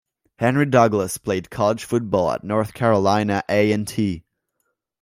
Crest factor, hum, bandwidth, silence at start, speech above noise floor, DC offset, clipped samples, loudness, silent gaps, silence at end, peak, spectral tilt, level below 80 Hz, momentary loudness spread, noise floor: 18 dB; none; 16 kHz; 0.4 s; 54 dB; under 0.1%; under 0.1%; -20 LUFS; none; 0.8 s; -2 dBFS; -6 dB/octave; -54 dBFS; 8 LU; -74 dBFS